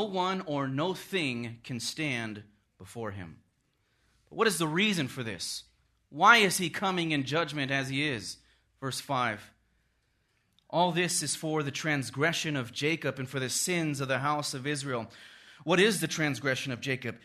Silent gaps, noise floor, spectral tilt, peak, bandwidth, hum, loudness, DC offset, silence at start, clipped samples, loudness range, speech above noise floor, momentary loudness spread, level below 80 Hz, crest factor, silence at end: none; -73 dBFS; -3.5 dB/octave; -6 dBFS; 13.5 kHz; none; -29 LUFS; under 0.1%; 0 s; under 0.1%; 7 LU; 43 dB; 15 LU; -70 dBFS; 26 dB; 0.05 s